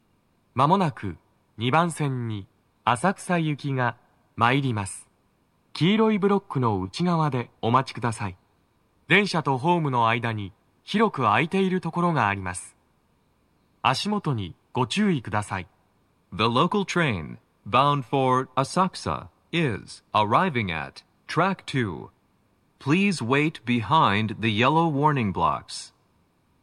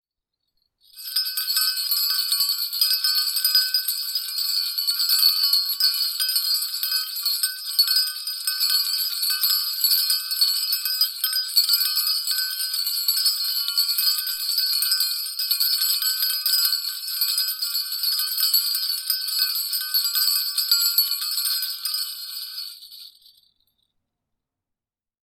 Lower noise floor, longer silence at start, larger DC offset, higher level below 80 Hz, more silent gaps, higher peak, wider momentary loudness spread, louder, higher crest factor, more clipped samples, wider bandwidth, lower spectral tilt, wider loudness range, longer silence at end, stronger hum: second, -66 dBFS vs -88 dBFS; second, 0.55 s vs 0.95 s; neither; first, -60 dBFS vs -80 dBFS; neither; about the same, -4 dBFS vs -4 dBFS; first, 13 LU vs 6 LU; second, -24 LUFS vs -20 LUFS; about the same, 22 dB vs 20 dB; neither; second, 13 kHz vs 19 kHz; first, -6 dB/octave vs 9 dB/octave; about the same, 3 LU vs 3 LU; second, 0.75 s vs 2.2 s; neither